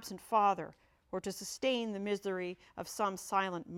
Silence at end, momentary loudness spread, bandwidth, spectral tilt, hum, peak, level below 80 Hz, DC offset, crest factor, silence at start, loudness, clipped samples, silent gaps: 0 s; 13 LU; 16.5 kHz; -4 dB/octave; none; -18 dBFS; -72 dBFS; under 0.1%; 18 dB; 0 s; -35 LUFS; under 0.1%; none